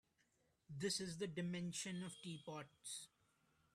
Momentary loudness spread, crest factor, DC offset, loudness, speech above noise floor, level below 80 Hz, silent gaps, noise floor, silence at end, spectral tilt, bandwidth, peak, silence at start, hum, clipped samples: 10 LU; 18 dB; under 0.1%; -47 LUFS; 34 dB; -82 dBFS; none; -81 dBFS; 0.65 s; -4 dB/octave; 14.5 kHz; -30 dBFS; 0.7 s; none; under 0.1%